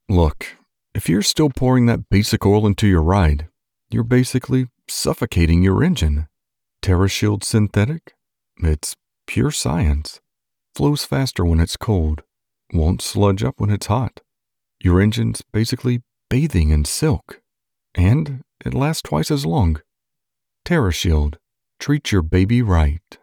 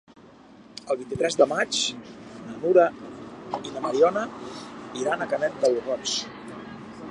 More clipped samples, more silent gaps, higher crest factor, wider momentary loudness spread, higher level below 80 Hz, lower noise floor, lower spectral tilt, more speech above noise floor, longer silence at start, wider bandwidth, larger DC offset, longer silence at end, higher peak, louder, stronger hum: neither; neither; second, 16 dB vs 22 dB; second, 10 LU vs 19 LU; first, -28 dBFS vs -64 dBFS; first, -84 dBFS vs -50 dBFS; first, -6 dB/octave vs -3 dB/octave; first, 66 dB vs 25 dB; about the same, 0.1 s vs 0.15 s; first, 18.5 kHz vs 11.5 kHz; neither; about the same, 0.1 s vs 0 s; about the same, -4 dBFS vs -4 dBFS; first, -19 LUFS vs -25 LUFS; neither